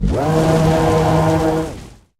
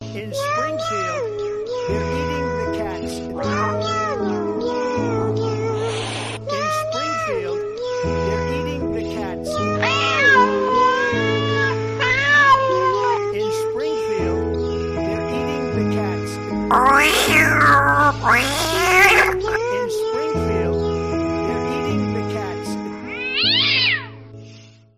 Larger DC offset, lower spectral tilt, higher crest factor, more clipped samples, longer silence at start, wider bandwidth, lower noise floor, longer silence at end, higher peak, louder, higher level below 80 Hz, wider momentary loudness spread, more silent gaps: neither; first, -7 dB/octave vs -4 dB/octave; about the same, 14 dB vs 16 dB; neither; about the same, 0 s vs 0 s; about the same, 15 kHz vs 15.5 kHz; second, -35 dBFS vs -44 dBFS; about the same, 0.3 s vs 0.3 s; about the same, -2 dBFS vs -2 dBFS; first, -15 LUFS vs -19 LUFS; first, -28 dBFS vs -42 dBFS; about the same, 10 LU vs 12 LU; neither